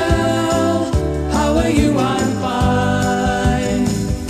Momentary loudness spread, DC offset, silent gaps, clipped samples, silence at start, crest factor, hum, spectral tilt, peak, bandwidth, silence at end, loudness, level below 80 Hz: 4 LU; under 0.1%; none; under 0.1%; 0 s; 14 dB; none; -6 dB/octave; -2 dBFS; 13 kHz; 0 s; -17 LUFS; -26 dBFS